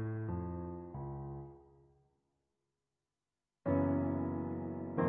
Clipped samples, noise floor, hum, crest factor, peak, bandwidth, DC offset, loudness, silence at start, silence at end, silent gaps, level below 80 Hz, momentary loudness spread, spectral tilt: under 0.1%; under -90 dBFS; none; 18 dB; -20 dBFS; 3.4 kHz; under 0.1%; -39 LUFS; 0 s; 0 s; none; -60 dBFS; 12 LU; -11 dB/octave